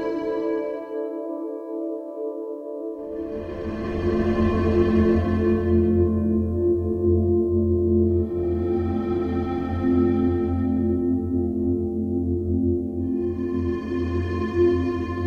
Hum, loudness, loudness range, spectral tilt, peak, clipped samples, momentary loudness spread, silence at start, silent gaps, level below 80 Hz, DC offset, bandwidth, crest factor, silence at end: none; -23 LUFS; 8 LU; -10 dB/octave; -8 dBFS; under 0.1%; 11 LU; 0 s; none; -38 dBFS; under 0.1%; 5.6 kHz; 16 dB; 0 s